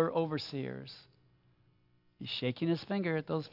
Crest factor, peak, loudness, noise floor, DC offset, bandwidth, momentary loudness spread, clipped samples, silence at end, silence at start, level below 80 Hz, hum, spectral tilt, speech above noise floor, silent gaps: 20 dB; -16 dBFS; -35 LUFS; -70 dBFS; under 0.1%; 5.8 kHz; 14 LU; under 0.1%; 0 s; 0 s; -76 dBFS; none; -7.5 dB/octave; 35 dB; none